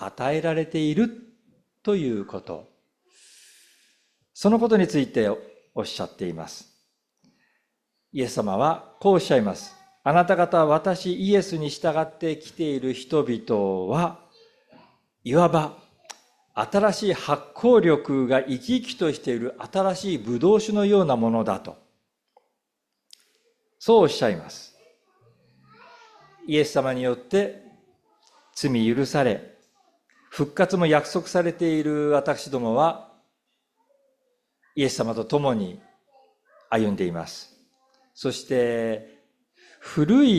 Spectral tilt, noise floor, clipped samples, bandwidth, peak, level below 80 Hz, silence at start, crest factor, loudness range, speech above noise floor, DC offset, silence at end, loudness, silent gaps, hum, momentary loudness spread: -6 dB/octave; -80 dBFS; under 0.1%; 14 kHz; -4 dBFS; -62 dBFS; 0 s; 20 dB; 7 LU; 58 dB; under 0.1%; 0 s; -23 LUFS; none; none; 15 LU